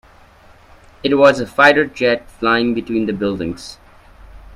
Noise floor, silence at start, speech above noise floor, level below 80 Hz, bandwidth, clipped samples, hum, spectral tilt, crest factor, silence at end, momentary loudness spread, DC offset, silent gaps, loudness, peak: -46 dBFS; 1.05 s; 30 dB; -46 dBFS; 12.5 kHz; under 0.1%; none; -5.5 dB/octave; 18 dB; 0 s; 13 LU; under 0.1%; none; -15 LUFS; 0 dBFS